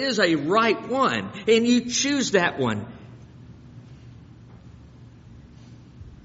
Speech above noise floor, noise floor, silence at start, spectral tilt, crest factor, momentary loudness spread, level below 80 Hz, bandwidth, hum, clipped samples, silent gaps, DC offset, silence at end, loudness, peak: 25 dB; -46 dBFS; 0 s; -3 dB/octave; 20 dB; 8 LU; -56 dBFS; 8 kHz; none; under 0.1%; none; under 0.1%; 0.1 s; -22 LUFS; -6 dBFS